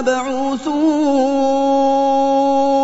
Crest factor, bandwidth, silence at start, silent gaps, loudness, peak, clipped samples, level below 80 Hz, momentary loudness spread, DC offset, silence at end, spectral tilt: 10 dB; 8 kHz; 0 s; none; -16 LUFS; -4 dBFS; under 0.1%; -52 dBFS; 5 LU; under 0.1%; 0 s; -4 dB/octave